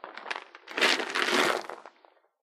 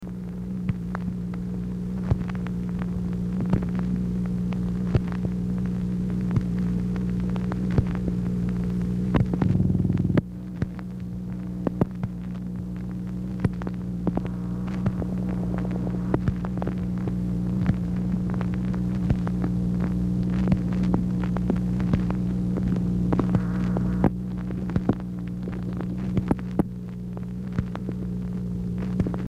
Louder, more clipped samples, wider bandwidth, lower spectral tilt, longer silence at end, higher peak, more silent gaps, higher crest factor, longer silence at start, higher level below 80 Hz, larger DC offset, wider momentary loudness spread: about the same, -27 LUFS vs -27 LUFS; neither; first, 16 kHz vs 7.8 kHz; second, -1 dB/octave vs -9.5 dB/octave; first, 0.55 s vs 0 s; about the same, -8 dBFS vs -8 dBFS; neither; first, 24 dB vs 18 dB; about the same, 0.05 s vs 0 s; second, -82 dBFS vs -36 dBFS; neither; first, 15 LU vs 8 LU